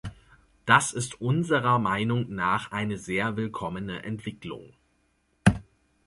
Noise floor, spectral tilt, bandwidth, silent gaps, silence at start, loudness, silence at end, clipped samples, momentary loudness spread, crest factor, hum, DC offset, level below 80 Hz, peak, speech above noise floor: -70 dBFS; -5 dB/octave; 11.5 kHz; none; 0.05 s; -26 LUFS; 0.45 s; under 0.1%; 17 LU; 24 dB; none; under 0.1%; -48 dBFS; -4 dBFS; 43 dB